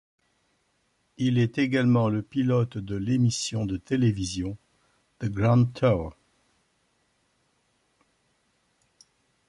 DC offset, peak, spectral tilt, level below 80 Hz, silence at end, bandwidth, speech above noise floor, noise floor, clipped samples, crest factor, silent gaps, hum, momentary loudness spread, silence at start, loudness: under 0.1%; -10 dBFS; -6.5 dB/octave; -52 dBFS; 3.35 s; 11.5 kHz; 47 dB; -71 dBFS; under 0.1%; 16 dB; none; none; 11 LU; 1.2 s; -25 LUFS